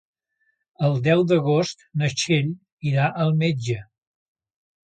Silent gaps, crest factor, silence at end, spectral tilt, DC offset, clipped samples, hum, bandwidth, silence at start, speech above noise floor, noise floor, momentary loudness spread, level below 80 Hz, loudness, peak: 2.72-2.77 s; 18 dB; 1 s; -6 dB/octave; under 0.1%; under 0.1%; none; 9 kHz; 0.8 s; 50 dB; -71 dBFS; 10 LU; -62 dBFS; -22 LUFS; -6 dBFS